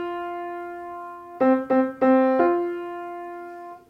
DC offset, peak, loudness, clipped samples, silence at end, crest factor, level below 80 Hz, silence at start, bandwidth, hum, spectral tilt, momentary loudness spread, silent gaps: under 0.1%; -8 dBFS; -22 LUFS; under 0.1%; 0.1 s; 16 dB; -68 dBFS; 0 s; 4.6 kHz; none; -7.5 dB/octave; 18 LU; none